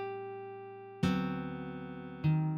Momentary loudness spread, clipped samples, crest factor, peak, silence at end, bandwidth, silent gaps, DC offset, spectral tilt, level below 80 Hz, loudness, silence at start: 13 LU; under 0.1%; 18 dB; -18 dBFS; 0 s; 8.2 kHz; none; under 0.1%; -8 dB/octave; -60 dBFS; -37 LUFS; 0 s